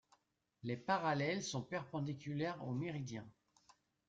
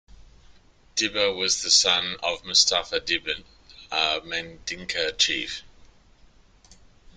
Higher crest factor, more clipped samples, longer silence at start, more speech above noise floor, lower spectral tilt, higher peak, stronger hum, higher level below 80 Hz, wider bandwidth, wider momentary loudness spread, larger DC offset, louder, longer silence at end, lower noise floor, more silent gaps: about the same, 20 dB vs 22 dB; neither; first, 0.65 s vs 0.2 s; first, 37 dB vs 30 dB; first, -5.5 dB/octave vs 0 dB/octave; second, -22 dBFS vs -4 dBFS; neither; second, -76 dBFS vs -54 dBFS; second, 9 kHz vs 12.5 kHz; about the same, 12 LU vs 14 LU; neither; second, -41 LUFS vs -23 LUFS; second, 0.8 s vs 1.5 s; first, -78 dBFS vs -55 dBFS; neither